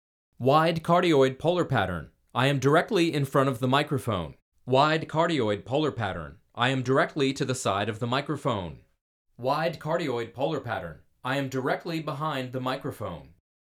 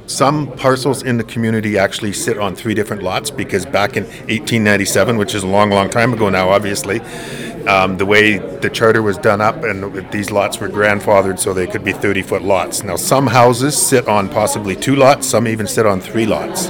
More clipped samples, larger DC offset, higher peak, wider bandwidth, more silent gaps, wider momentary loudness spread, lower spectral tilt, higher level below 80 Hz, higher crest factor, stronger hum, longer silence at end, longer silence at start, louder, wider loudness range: second, under 0.1% vs 0.3%; neither; second, -8 dBFS vs 0 dBFS; second, 16 kHz vs over 20 kHz; first, 4.42-4.52 s, 9.01-9.25 s vs none; first, 12 LU vs 9 LU; first, -6 dB/octave vs -4.5 dB/octave; second, -60 dBFS vs -46 dBFS; first, 20 dB vs 14 dB; neither; first, 0.4 s vs 0 s; first, 0.4 s vs 0 s; second, -26 LUFS vs -14 LUFS; first, 7 LU vs 4 LU